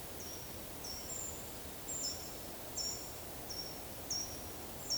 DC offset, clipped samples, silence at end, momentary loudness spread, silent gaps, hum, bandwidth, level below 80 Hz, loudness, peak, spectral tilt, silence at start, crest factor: under 0.1%; under 0.1%; 0 s; 6 LU; none; none; over 20 kHz; -58 dBFS; -41 LUFS; -26 dBFS; -2 dB/octave; 0 s; 16 dB